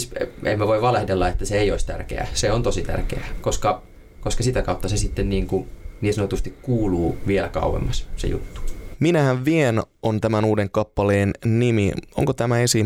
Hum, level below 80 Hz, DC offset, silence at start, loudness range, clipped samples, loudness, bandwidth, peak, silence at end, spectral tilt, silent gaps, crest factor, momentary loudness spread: none; -30 dBFS; under 0.1%; 0 s; 4 LU; under 0.1%; -22 LUFS; 16 kHz; -4 dBFS; 0 s; -5.5 dB/octave; none; 16 dB; 9 LU